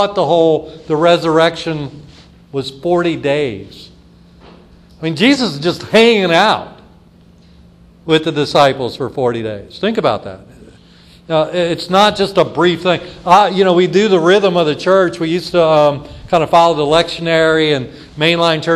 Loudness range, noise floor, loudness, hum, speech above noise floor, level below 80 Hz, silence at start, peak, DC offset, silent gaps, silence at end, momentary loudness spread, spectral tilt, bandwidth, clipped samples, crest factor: 6 LU; -44 dBFS; -13 LUFS; none; 31 dB; -46 dBFS; 0 s; 0 dBFS; under 0.1%; none; 0 s; 12 LU; -5.5 dB/octave; 13 kHz; under 0.1%; 14 dB